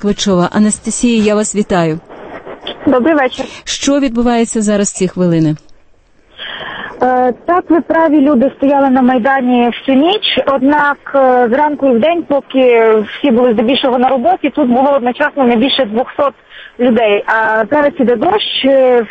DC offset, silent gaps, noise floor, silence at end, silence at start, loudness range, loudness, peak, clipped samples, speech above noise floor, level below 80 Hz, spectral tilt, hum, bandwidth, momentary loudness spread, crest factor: under 0.1%; none; -46 dBFS; 0 s; 0 s; 4 LU; -11 LUFS; 0 dBFS; under 0.1%; 35 dB; -42 dBFS; -4.5 dB/octave; none; 8.8 kHz; 7 LU; 12 dB